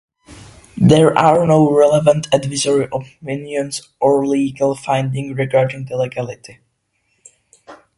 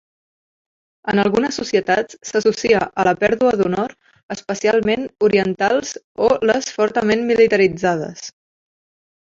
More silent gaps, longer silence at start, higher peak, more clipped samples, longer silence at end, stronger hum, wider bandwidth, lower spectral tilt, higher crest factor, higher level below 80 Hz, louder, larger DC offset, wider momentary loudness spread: second, none vs 4.23-4.29 s, 6.04-6.15 s; second, 0.3 s vs 1.05 s; about the same, 0 dBFS vs -2 dBFS; neither; second, 0.25 s vs 0.95 s; neither; first, 11.5 kHz vs 7.8 kHz; first, -6 dB/octave vs -4.5 dB/octave; about the same, 16 dB vs 18 dB; about the same, -50 dBFS vs -54 dBFS; about the same, -16 LUFS vs -18 LUFS; neither; first, 15 LU vs 12 LU